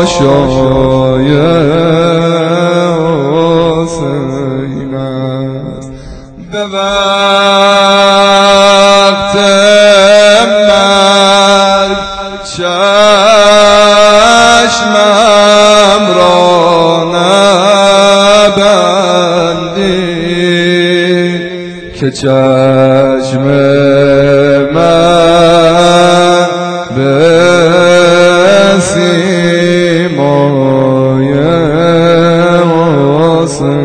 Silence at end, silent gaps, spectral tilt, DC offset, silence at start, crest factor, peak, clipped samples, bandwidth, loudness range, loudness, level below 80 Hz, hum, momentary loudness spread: 0 s; none; -4.5 dB/octave; under 0.1%; 0 s; 6 dB; 0 dBFS; 5%; 11 kHz; 6 LU; -6 LUFS; -34 dBFS; none; 11 LU